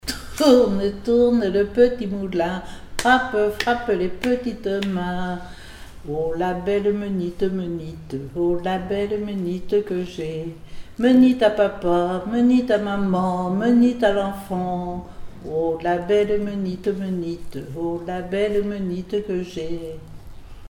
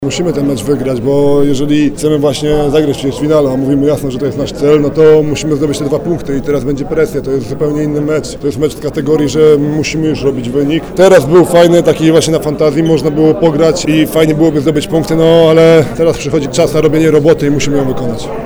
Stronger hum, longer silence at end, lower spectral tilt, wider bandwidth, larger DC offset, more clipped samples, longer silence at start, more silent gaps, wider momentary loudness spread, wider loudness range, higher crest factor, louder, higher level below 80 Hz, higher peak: neither; about the same, 0 s vs 0 s; about the same, -6.5 dB/octave vs -6 dB/octave; second, 16 kHz vs over 20 kHz; neither; second, under 0.1% vs 0.8%; about the same, 0.05 s vs 0 s; neither; first, 15 LU vs 8 LU; about the same, 6 LU vs 4 LU; first, 18 dB vs 10 dB; second, -22 LUFS vs -10 LUFS; second, -42 dBFS vs -32 dBFS; about the same, -2 dBFS vs 0 dBFS